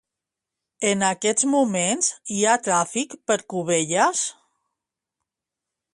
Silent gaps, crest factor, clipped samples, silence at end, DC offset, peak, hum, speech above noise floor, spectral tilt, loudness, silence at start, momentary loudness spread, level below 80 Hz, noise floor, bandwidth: none; 20 dB; under 0.1%; 1.6 s; under 0.1%; -4 dBFS; none; 64 dB; -3 dB/octave; -22 LUFS; 0.8 s; 6 LU; -70 dBFS; -86 dBFS; 11.5 kHz